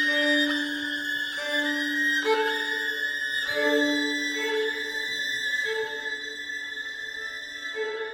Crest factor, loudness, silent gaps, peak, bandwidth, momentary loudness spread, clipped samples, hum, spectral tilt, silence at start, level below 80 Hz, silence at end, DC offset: 16 dB; -26 LUFS; none; -12 dBFS; 19 kHz; 10 LU; under 0.1%; none; -1 dB/octave; 0 s; -68 dBFS; 0 s; under 0.1%